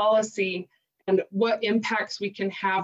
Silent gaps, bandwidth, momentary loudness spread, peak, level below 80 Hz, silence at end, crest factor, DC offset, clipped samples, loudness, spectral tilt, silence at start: none; 8.2 kHz; 7 LU; -12 dBFS; -76 dBFS; 0 s; 14 dB; under 0.1%; under 0.1%; -26 LUFS; -4.5 dB/octave; 0 s